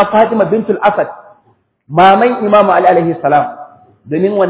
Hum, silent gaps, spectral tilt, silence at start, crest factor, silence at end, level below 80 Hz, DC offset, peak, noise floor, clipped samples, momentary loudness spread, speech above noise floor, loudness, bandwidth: none; none; -10 dB/octave; 0 s; 12 dB; 0 s; -54 dBFS; under 0.1%; 0 dBFS; -54 dBFS; 0.3%; 10 LU; 44 dB; -11 LUFS; 4 kHz